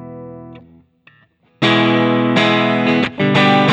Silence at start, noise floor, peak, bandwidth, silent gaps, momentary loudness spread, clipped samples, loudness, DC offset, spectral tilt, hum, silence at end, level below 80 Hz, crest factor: 0 s; -54 dBFS; -2 dBFS; 9.2 kHz; none; 17 LU; under 0.1%; -14 LUFS; under 0.1%; -6.5 dB/octave; none; 0 s; -56 dBFS; 14 dB